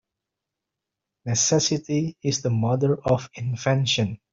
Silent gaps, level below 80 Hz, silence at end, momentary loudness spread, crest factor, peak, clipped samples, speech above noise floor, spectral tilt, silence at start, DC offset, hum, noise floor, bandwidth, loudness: none; -58 dBFS; 0.15 s; 7 LU; 18 dB; -6 dBFS; under 0.1%; 62 dB; -4.5 dB/octave; 1.25 s; under 0.1%; none; -85 dBFS; 7.8 kHz; -23 LUFS